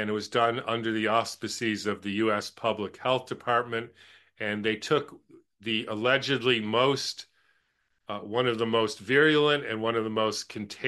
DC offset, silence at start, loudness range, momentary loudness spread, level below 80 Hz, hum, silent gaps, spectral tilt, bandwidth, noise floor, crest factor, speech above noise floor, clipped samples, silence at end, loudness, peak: under 0.1%; 0 s; 3 LU; 10 LU; -72 dBFS; none; none; -4.5 dB/octave; 12.5 kHz; -74 dBFS; 18 dB; 46 dB; under 0.1%; 0 s; -27 LUFS; -10 dBFS